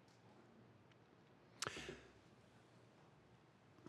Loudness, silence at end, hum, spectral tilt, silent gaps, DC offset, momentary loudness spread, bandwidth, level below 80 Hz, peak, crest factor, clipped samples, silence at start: -51 LUFS; 0 s; none; -2.5 dB/octave; none; under 0.1%; 21 LU; 13 kHz; -80 dBFS; -28 dBFS; 32 dB; under 0.1%; 0 s